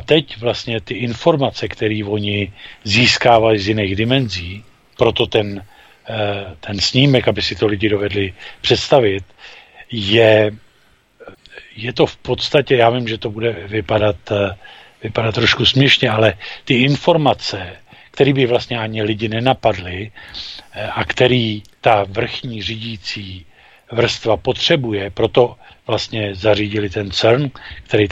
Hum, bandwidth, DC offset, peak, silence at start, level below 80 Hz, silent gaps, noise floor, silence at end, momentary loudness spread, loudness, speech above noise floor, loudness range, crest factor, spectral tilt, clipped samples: none; 8.4 kHz; under 0.1%; 0 dBFS; 0 s; -44 dBFS; none; -54 dBFS; 0 s; 15 LU; -16 LUFS; 38 dB; 4 LU; 18 dB; -5.5 dB/octave; under 0.1%